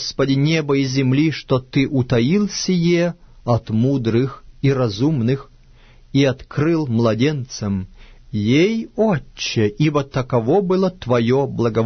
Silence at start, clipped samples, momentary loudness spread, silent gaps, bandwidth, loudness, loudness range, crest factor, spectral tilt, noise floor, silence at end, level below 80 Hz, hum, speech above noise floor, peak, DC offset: 0 s; under 0.1%; 7 LU; none; 6.6 kHz; -19 LUFS; 2 LU; 14 dB; -6.5 dB/octave; -46 dBFS; 0 s; -44 dBFS; none; 29 dB; -4 dBFS; under 0.1%